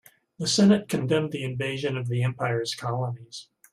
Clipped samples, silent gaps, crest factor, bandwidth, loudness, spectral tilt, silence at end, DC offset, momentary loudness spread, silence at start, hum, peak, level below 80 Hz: under 0.1%; none; 18 dB; 14 kHz; -26 LUFS; -5.5 dB/octave; 0.3 s; under 0.1%; 12 LU; 0.4 s; none; -8 dBFS; -64 dBFS